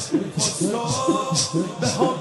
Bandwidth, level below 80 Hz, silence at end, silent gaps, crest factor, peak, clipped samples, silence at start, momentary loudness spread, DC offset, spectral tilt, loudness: 12 kHz; -56 dBFS; 0 s; none; 16 dB; -6 dBFS; under 0.1%; 0 s; 3 LU; under 0.1%; -4 dB/octave; -22 LUFS